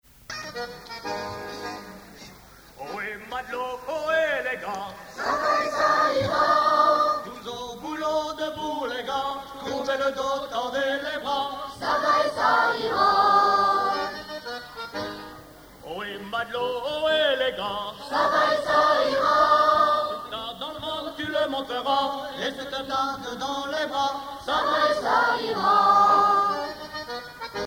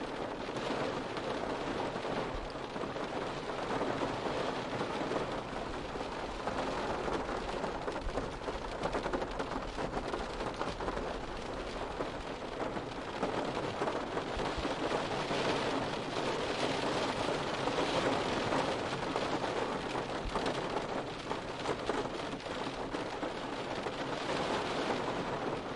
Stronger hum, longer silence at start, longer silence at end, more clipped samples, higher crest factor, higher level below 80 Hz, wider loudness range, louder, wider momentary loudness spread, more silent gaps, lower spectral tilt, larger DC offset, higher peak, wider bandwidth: neither; first, 0.3 s vs 0 s; about the same, 0 s vs 0 s; neither; about the same, 18 dB vs 18 dB; second, -58 dBFS vs -52 dBFS; first, 8 LU vs 4 LU; first, -24 LUFS vs -36 LUFS; first, 16 LU vs 6 LU; neither; about the same, -3.5 dB/octave vs -4.5 dB/octave; neither; first, -8 dBFS vs -18 dBFS; first, over 20 kHz vs 11.5 kHz